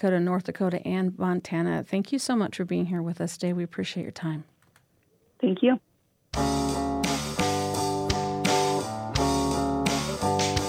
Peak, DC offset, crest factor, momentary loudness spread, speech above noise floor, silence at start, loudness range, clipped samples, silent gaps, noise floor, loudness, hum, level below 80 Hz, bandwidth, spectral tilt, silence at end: -10 dBFS; under 0.1%; 18 dB; 7 LU; 39 dB; 0 s; 4 LU; under 0.1%; none; -66 dBFS; -27 LUFS; none; -46 dBFS; 16.5 kHz; -5 dB/octave; 0 s